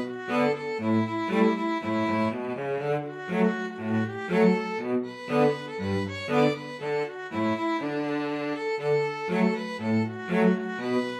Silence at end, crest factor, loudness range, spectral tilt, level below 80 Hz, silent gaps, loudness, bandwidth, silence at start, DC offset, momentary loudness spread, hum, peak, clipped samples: 0 s; 18 dB; 2 LU; -7 dB/octave; -72 dBFS; none; -27 LUFS; 11.5 kHz; 0 s; under 0.1%; 6 LU; none; -10 dBFS; under 0.1%